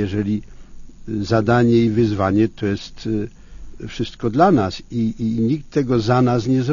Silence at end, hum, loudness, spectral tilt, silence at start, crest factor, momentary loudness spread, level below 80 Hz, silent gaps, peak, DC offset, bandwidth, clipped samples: 0 s; none; -19 LUFS; -7.5 dB/octave; 0 s; 18 dB; 12 LU; -40 dBFS; none; -2 dBFS; under 0.1%; 7.4 kHz; under 0.1%